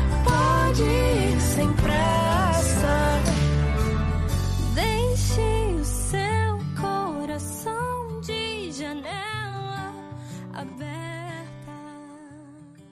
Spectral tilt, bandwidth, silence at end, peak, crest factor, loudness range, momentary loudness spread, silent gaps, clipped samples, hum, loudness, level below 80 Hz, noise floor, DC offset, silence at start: -5.5 dB/octave; 13 kHz; 0.1 s; -8 dBFS; 16 dB; 12 LU; 16 LU; none; under 0.1%; none; -24 LUFS; -30 dBFS; -46 dBFS; under 0.1%; 0 s